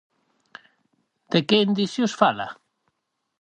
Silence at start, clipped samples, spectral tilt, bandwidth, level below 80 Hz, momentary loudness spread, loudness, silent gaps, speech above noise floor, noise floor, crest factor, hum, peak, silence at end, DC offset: 1.3 s; under 0.1%; -5.5 dB/octave; 9.4 kHz; -68 dBFS; 10 LU; -22 LUFS; none; 55 dB; -76 dBFS; 24 dB; none; -2 dBFS; 0.9 s; under 0.1%